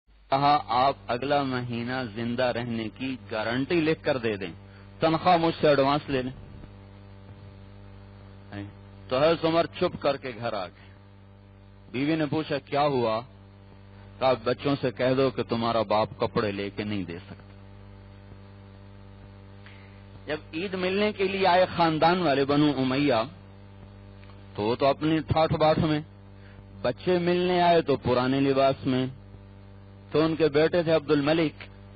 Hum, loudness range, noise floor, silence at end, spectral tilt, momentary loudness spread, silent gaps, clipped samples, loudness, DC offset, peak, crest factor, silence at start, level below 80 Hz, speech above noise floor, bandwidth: none; 8 LU; -50 dBFS; 0 s; -4.5 dB/octave; 15 LU; none; under 0.1%; -26 LUFS; under 0.1%; -12 dBFS; 14 dB; 0.3 s; -54 dBFS; 26 dB; 5.6 kHz